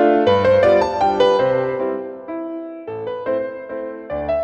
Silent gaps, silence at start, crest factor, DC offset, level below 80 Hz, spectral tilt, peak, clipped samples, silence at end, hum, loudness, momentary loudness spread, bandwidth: none; 0 s; 16 dB; under 0.1%; -48 dBFS; -6.5 dB/octave; -2 dBFS; under 0.1%; 0 s; none; -18 LUFS; 15 LU; 7.8 kHz